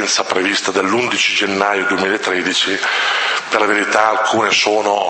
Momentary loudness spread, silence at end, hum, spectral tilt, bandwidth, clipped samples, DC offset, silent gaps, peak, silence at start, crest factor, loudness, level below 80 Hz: 3 LU; 0 s; none; -2 dB/octave; 8.8 kHz; under 0.1%; under 0.1%; none; 0 dBFS; 0 s; 16 dB; -15 LUFS; -62 dBFS